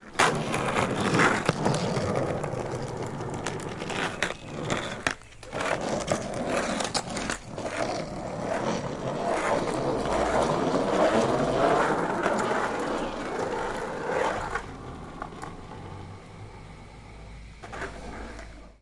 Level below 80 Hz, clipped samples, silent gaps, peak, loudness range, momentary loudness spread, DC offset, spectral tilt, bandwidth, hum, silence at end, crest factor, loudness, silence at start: -48 dBFS; under 0.1%; none; -4 dBFS; 11 LU; 18 LU; under 0.1%; -4.5 dB/octave; 11.5 kHz; none; 0.1 s; 24 dB; -28 LUFS; 0 s